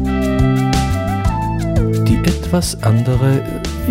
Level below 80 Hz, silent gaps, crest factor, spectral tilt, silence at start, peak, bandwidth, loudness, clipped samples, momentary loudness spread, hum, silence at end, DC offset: -24 dBFS; none; 12 dB; -6.5 dB/octave; 0 s; -2 dBFS; 16 kHz; -16 LUFS; under 0.1%; 4 LU; none; 0 s; under 0.1%